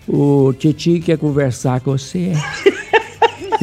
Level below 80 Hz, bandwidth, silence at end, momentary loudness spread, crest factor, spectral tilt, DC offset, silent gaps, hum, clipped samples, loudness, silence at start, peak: -48 dBFS; 13.5 kHz; 0 s; 6 LU; 16 dB; -6.5 dB/octave; under 0.1%; none; none; under 0.1%; -16 LUFS; 0.1 s; 0 dBFS